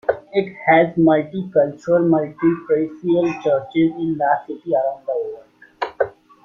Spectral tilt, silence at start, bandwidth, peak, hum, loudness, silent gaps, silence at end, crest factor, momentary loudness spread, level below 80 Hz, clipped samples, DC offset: -8.5 dB/octave; 0.1 s; 7 kHz; -2 dBFS; none; -19 LUFS; none; 0.35 s; 16 dB; 10 LU; -60 dBFS; under 0.1%; under 0.1%